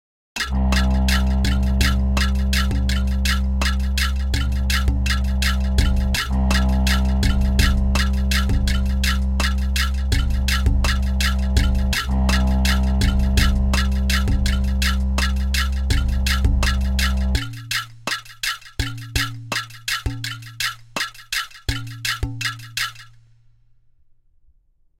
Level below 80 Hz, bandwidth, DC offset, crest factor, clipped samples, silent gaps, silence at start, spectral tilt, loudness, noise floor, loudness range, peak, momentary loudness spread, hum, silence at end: -20 dBFS; 16 kHz; under 0.1%; 16 dB; under 0.1%; none; 0.35 s; -4.5 dB/octave; -21 LUFS; -58 dBFS; 6 LU; -2 dBFS; 7 LU; none; 1.95 s